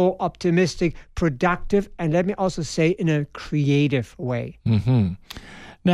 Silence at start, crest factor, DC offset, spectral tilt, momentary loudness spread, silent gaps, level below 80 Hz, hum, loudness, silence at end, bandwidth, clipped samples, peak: 0 s; 16 dB; under 0.1%; -7 dB/octave; 8 LU; none; -42 dBFS; none; -23 LUFS; 0 s; 12.5 kHz; under 0.1%; -6 dBFS